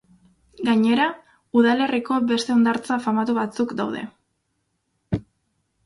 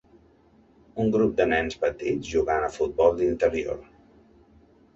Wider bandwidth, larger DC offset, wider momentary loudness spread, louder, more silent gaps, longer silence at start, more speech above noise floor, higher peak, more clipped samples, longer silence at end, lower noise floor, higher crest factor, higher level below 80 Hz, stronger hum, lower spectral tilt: first, 11.5 kHz vs 8 kHz; neither; about the same, 11 LU vs 9 LU; first, -22 LUFS vs -25 LUFS; neither; second, 0.6 s vs 0.95 s; first, 53 dB vs 34 dB; about the same, -6 dBFS vs -6 dBFS; neither; second, 0.65 s vs 1.15 s; first, -73 dBFS vs -58 dBFS; about the same, 18 dB vs 20 dB; second, -56 dBFS vs -48 dBFS; neither; about the same, -5.5 dB/octave vs -6 dB/octave